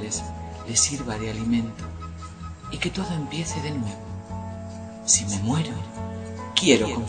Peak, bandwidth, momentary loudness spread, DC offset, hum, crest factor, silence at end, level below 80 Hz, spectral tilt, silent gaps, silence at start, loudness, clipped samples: 0 dBFS; 9.4 kHz; 17 LU; under 0.1%; none; 26 dB; 0 s; -44 dBFS; -3.5 dB/octave; none; 0 s; -25 LUFS; under 0.1%